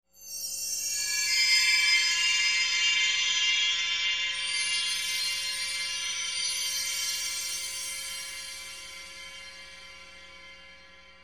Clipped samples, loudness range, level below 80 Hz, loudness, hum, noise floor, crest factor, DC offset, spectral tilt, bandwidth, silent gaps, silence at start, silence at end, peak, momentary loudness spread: under 0.1%; 13 LU; -64 dBFS; -25 LUFS; none; -53 dBFS; 18 dB; 0.1%; 3.5 dB/octave; 19 kHz; none; 0.15 s; 0.1 s; -12 dBFS; 21 LU